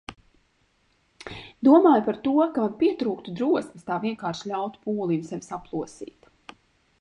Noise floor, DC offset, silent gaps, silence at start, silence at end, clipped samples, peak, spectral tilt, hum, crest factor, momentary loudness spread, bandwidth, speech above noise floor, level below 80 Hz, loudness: -67 dBFS; under 0.1%; none; 0.1 s; 0.95 s; under 0.1%; -4 dBFS; -7 dB/octave; none; 20 dB; 22 LU; 10.5 kHz; 43 dB; -62 dBFS; -24 LUFS